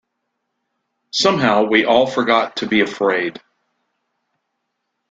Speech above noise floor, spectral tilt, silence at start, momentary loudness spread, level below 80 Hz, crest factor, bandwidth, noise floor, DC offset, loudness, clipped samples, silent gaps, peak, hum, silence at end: 59 dB; -4 dB/octave; 1.15 s; 6 LU; -60 dBFS; 18 dB; 9.2 kHz; -75 dBFS; under 0.1%; -16 LUFS; under 0.1%; none; -2 dBFS; none; 1.7 s